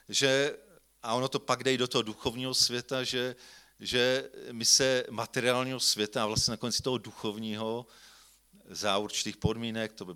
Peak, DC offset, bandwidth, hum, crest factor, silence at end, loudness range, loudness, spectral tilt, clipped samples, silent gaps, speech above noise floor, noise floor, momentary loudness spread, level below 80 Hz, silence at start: -10 dBFS; under 0.1%; 18 kHz; none; 22 dB; 0 s; 5 LU; -29 LUFS; -2.5 dB/octave; under 0.1%; none; 29 dB; -60 dBFS; 11 LU; -58 dBFS; 0.1 s